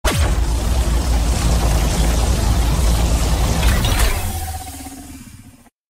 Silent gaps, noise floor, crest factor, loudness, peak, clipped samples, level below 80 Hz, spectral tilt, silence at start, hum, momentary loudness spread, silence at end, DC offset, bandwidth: none; -44 dBFS; 14 dB; -18 LUFS; -4 dBFS; under 0.1%; -18 dBFS; -4.5 dB/octave; 0.05 s; none; 14 LU; 0.4 s; under 0.1%; 16.5 kHz